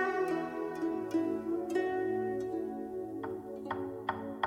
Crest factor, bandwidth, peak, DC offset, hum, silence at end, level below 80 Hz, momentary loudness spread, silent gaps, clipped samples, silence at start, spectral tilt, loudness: 18 dB; 16 kHz; -16 dBFS; under 0.1%; none; 0 s; -70 dBFS; 7 LU; none; under 0.1%; 0 s; -6.5 dB/octave; -36 LUFS